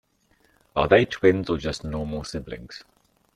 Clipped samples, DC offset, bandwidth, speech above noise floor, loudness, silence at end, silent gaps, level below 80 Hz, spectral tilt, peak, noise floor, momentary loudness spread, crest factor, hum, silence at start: under 0.1%; under 0.1%; 11 kHz; 41 dB; -23 LUFS; 0.55 s; none; -46 dBFS; -6 dB/octave; -4 dBFS; -64 dBFS; 19 LU; 22 dB; none; 0.75 s